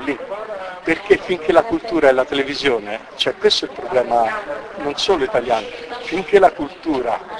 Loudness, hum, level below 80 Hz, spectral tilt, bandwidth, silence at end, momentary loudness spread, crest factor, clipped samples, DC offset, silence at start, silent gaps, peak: -18 LUFS; none; -48 dBFS; -4 dB/octave; 11 kHz; 0 s; 12 LU; 18 dB; under 0.1%; under 0.1%; 0 s; none; 0 dBFS